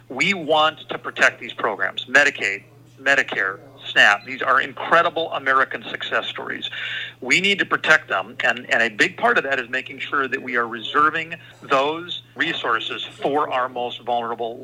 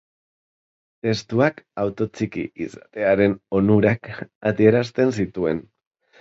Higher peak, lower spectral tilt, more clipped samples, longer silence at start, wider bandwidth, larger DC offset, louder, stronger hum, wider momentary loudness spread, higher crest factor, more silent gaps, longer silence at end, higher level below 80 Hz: about the same, 0 dBFS vs -2 dBFS; second, -2.5 dB/octave vs -7.5 dB/octave; neither; second, 0.1 s vs 1.05 s; first, 16 kHz vs 7.8 kHz; neither; about the same, -20 LUFS vs -21 LUFS; neither; about the same, 11 LU vs 12 LU; about the same, 22 dB vs 20 dB; second, none vs 4.35-4.41 s; second, 0 s vs 0.6 s; second, -70 dBFS vs -52 dBFS